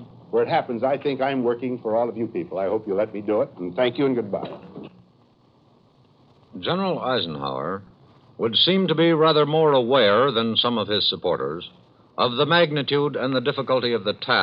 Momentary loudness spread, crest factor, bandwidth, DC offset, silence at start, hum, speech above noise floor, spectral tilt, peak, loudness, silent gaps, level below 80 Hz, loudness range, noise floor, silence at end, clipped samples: 12 LU; 16 dB; 5.4 kHz; under 0.1%; 0 s; none; 36 dB; -8.5 dB/octave; -6 dBFS; -22 LUFS; none; -66 dBFS; 10 LU; -57 dBFS; 0 s; under 0.1%